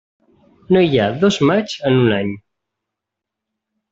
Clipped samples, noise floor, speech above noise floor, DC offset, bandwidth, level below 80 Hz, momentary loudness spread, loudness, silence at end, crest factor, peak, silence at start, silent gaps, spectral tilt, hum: under 0.1%; -82 dBFS; 67 dB; under 0.1%; 7.8 kHz; -54 dBFS; 8 LU; -16 LUFS; 1.55 s; 16 dB; -2 dBFS; 0.7 s; none; -6.5 dB/octave; none